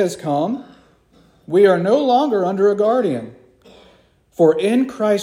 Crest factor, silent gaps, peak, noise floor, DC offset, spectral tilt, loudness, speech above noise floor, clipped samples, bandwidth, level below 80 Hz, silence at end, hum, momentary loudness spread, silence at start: 16 dB; none; -2 dBFS; -53 dBFS; under 0.1%; -6.5 dB/octave; -17 LUFS; 37 dB; under 0.1%; 15 kHz; -62 dBFS; 0 s; none; 12 LU; 0 s